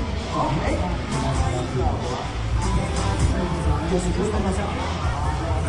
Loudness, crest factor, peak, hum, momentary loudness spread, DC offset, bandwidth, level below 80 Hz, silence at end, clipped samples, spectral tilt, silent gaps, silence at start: -24 LUFS; 14 dB; -8 dBFS; none; 3 LU; under 0.1%; 11.5 kHz; -28 dBFS; 0 s; under 0.1%; -6 dB/octave; none; 0 s